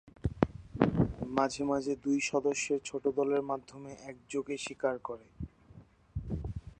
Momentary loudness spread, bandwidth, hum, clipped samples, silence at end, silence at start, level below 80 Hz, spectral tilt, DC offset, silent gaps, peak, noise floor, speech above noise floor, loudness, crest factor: 16 LU; 9.6 kHz; none; under 0.1%; 0.05 s; 0.05 s; -50 dBFS; -5.5 dB/octave; under 0.1%; none; -8 dBFS; -57 dBFS; 24 dB; -33 LUFS; 26 dB